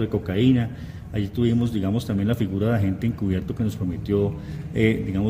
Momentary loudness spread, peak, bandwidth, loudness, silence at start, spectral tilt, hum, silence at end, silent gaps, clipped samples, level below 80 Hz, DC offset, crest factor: 9 LU; -4 dBFS; 16 kHz; -24 LUFS; 0 s; -8 dB/octave; none; 0 s; none; under 0.1%; -44 dBFS; under 0.1%; 18 dB